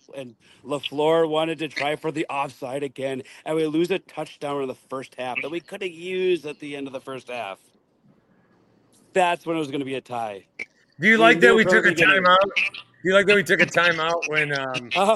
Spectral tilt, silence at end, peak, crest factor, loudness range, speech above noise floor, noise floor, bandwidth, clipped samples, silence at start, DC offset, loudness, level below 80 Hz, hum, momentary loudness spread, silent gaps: -4.5 dB/octave; 0 s; -2 dBFS; 22 dB; 13 LU; 38 dB; -60 dBFS; 15 kHz; under 0.1%; 0.15 s; under 0.1%; -21 LUFS; -64 dBFS; none; 18 LU; none